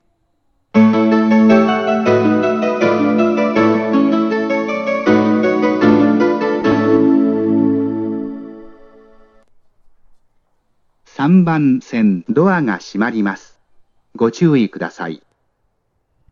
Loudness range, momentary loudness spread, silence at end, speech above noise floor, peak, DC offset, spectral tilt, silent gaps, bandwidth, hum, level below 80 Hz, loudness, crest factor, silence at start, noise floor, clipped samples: 8 LU; 10 LU; 1.15 s; 50 dB; 0 dBFS; under 0.1%; -7.5 dB/octave; none; 7 kHz; none; -56 dBFS; -14 LUFS; 16 dB; 0.75 s; -65 dBFS; under 0.1%